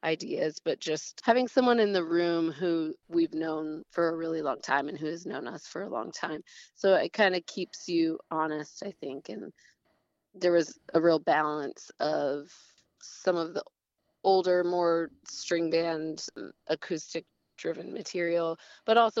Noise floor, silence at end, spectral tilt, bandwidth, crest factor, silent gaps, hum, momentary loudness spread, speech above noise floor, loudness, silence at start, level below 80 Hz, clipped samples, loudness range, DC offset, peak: -80 dBFS; 0 s; -4.5 dB/octave; 8 kHz; 20 dB; none; none; 14 LU; 51 dB; -30 LUFS; 0.05 s; -78 dBFS; under 0.1%; 5 LU; under 0.1%; -10 dBFS